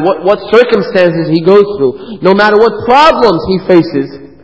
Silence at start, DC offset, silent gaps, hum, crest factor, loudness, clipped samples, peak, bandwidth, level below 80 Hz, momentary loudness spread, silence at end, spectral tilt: 0 s; 0.7%; none; none; 8 dB; -8 LUFS; 2%; 0 dBFS; 8 kHz; -40 dBFS; 8 LU; 0.2 s; -7 dB/octave